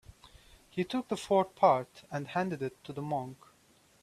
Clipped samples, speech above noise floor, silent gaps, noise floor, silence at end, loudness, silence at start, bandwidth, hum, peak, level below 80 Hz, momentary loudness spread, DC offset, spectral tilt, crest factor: under 0.1%; 33 dB; none; -65 dBFS; 0.7 s; -32 LUFS; 0.1 s; 14 kHz; none; -12 dBFS; -66 dBFS; 14 LU; under 0.1%; -6 dB/octave; 22 dB